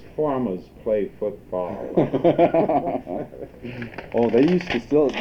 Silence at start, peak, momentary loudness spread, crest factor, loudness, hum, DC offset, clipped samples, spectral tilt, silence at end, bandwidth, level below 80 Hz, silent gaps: 0 s; -4 dBFS; 16 LU; 18 dB; -22 LUFS; none; under 0.1%; under 0.1%; -8 dB/octave; 0 s; 7.4 kHz; -50 dBFS; none